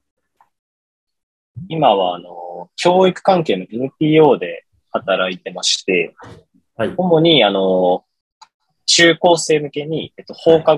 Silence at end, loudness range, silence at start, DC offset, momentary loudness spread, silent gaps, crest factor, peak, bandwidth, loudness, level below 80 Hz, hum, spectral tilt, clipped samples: 0 s; 3 LU; 1.55 s; under 0.1%; 15 LU; 8.21-8.41 s, 8.54-8.60 s; 16 dB; 0 dBFS; 11.5 kHz; -15 LUFS; -62 dBFS; none; -4 dB/octave; under 0.1%